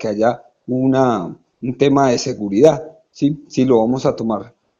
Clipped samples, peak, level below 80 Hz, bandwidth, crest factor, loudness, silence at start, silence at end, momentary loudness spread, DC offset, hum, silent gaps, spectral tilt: under 0.1%; 0 dBFS; -52 dBFS; 7.6 kHz; 16 dB; -17 LUFS; 0 s; 0.3 s; 13 LU; under 0.1%; none; none; -6.5 dB/octave